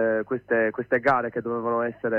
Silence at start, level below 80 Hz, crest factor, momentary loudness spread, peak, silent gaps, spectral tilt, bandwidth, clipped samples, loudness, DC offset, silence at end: 0 s; -62 dBFS; 16 dB; 6 LU; -10 dBFS; none; -8.5 dB/octave; 6 kHz; under 0.1%; -25 LUFS; under 0.1%; 0 s